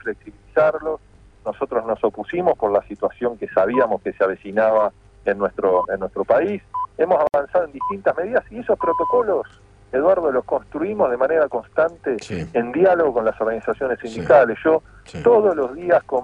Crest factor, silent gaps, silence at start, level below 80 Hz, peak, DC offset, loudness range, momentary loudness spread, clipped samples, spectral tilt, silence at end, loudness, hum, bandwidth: 18 dB; none; 0.05 s; -52 dBFS; -2 dBFS; under 0.1%; 3 LU; 10 LU; under 0.1%; -7 dB/octave; 0 s; -20 LUFS; none; 8.8 kHz